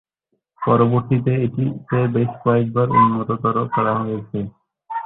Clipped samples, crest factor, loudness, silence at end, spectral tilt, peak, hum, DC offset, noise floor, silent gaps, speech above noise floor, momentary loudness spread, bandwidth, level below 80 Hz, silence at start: under 0.1%; 16 dB; -19 LUFS; 0 s; -12.5 dB/octave; -2 dBFS; none; under 0.1%; -73 dBFS; none; 55 dB; 11 LU; 4 kHz; -52 dBFS; 0.6 s